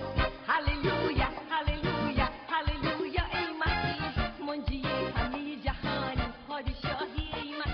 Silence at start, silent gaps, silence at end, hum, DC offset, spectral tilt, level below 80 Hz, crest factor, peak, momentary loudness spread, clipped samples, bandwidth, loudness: 0 s; none; 0 s; none; under 0.1%; -3.5 dB/octave; -38 dBFS; 18 dB; -14 dBFS; 6 LU; under 0.1%; 6.2 kHz; -32 LUFS